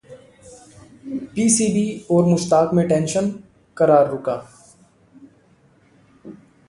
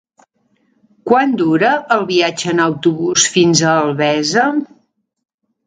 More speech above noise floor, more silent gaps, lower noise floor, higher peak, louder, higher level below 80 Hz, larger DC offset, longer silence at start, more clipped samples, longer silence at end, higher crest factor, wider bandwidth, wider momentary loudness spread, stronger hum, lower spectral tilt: second, 38 dB vs 47 dB; neither; second, -55 dBFS vs -61 dBFS; about the same, -2 dBFS vs 0 dBFS; second, -19 LUFS vs -14 LUFS; about the same, -56 dBFS vs -60 dBFS; neither; second, 0.1 s vs 1.05 s; neither; second, 0.35 s vs 1 s; about the same, 18 dB vs 16 dB; first, 11.5 kHz vs 9.6 kHz; first, 15 LU vs 5 LU; neither; first, -5.5 dB/octave vs -3.5 dB/octave